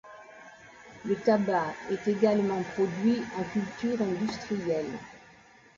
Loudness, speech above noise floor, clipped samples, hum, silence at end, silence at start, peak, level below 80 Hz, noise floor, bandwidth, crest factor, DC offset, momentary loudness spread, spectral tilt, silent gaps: -29 LUFS; 28 dB; under 0.1%; none; 0.55 s; 0.05 s; -10 dBFS; -64 dBFS; -56 dBFS; 7.6 kHz; 18 dB; under 0.1%; 23 LU; -6.5 dB/octave; none